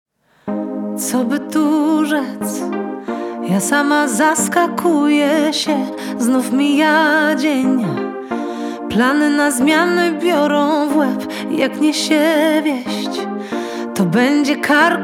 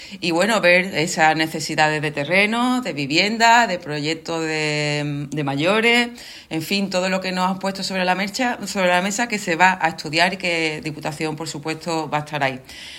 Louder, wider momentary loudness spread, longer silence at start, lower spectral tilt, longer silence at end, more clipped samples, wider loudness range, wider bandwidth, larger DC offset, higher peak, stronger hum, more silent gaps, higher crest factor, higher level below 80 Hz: first, -16 LUFS vs -19 LUFS; about the same, 10 LU vs 11 LU; first, 0.45 s vs 0 s; about the same, -4 dB/octave vs -4 dB/octave; about the same, 0 s vs 0 s; neither; about the same, 3 LU vs 3 LU; about the same, 17 kHz vs 16.5 kHz; neither; about the same, 0 dBFS vs 0 dBFS; neither; neither; about the same, 16 dB vs 20 dB; about the same, -60 dBFS vs -58 dBFS